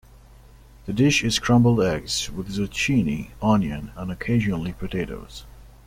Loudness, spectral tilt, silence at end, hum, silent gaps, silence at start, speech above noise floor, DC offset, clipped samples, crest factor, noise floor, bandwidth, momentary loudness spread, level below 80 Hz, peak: -23 LUFS; -5 dB/octave; 0.2 s; none; none; 0.85 s; 26 dB; under 0.1%; under 0.1%; 18 dB; -48 dBFS; 16 kHz; 14 LU; -42 dBFS; -6 dBFS